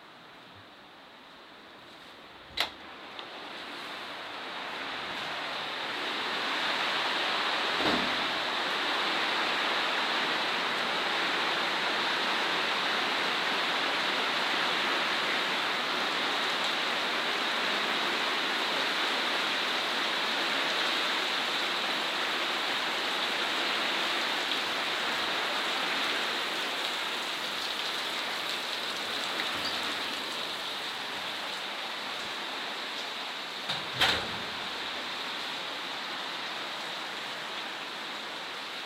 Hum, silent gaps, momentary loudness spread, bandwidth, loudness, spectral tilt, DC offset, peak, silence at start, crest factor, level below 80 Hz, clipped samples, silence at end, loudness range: none; none; 9 LU; 16 kHz; -29 LUFS; -1.5 dB/octave; under 0.1%; -10 dBFS; 0 s; 22 dB; -70 dBFS; under 0.1%; 0 s; 7 LU